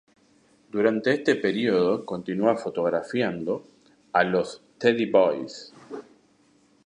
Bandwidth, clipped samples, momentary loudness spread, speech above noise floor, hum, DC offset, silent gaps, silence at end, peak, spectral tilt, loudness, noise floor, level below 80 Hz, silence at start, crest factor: 10 kHz; under 0.1%; 16 LU; 38 dB; none; under 0.1%; none; 0.85 s; -6 dBFS; -6 dB/octave; -25 LUFS; -61 dBFS; -68 dBFS; 0.75 s; 20 dB